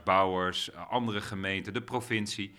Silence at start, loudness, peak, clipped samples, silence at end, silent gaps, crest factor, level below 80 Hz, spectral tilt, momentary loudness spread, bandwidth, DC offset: 0 s; -31 LUFS; -10 dBFS; under 0.1%; 0 s; none; 22 dB; -68 dBFS; -4.5 dB/octave; 8 LU; 17 kHz; under 0.1%